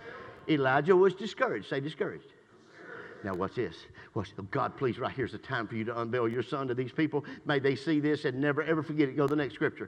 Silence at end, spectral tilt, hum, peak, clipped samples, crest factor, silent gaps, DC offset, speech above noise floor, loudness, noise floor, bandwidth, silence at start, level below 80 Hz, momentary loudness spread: 0 s; -7.5 dB/octave; none; -10 dBFS; under 0.1%; 20 dB; none; under 0.1%; 24 dB; -31 LUFS; -54 dBFS; 9.4 kHz; 0 s; -68 dBFS; 13 LU